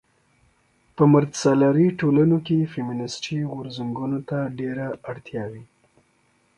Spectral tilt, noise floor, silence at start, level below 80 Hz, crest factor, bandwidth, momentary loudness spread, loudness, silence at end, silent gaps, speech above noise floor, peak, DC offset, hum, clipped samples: -7 dB/octave; -64 dBFS; 1 s; -60 dBFS; 20 dB; 11 kHz; 15 LU; -22 LUFS; 0.95 s; none; 42 dB; -4 dBFS; under 0.1%; none; under 0.1%